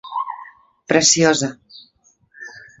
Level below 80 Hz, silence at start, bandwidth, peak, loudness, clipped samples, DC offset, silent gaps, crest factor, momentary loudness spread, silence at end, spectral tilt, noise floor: -60 dBFS; 0.05 s; 8.2 kHz; 0 dBFS; -16 LUFS; under 0.1%; under 0.1%; none; 22 dB; 24 LU; 0.2 s; -2.5 dB/octave; -58 dBFS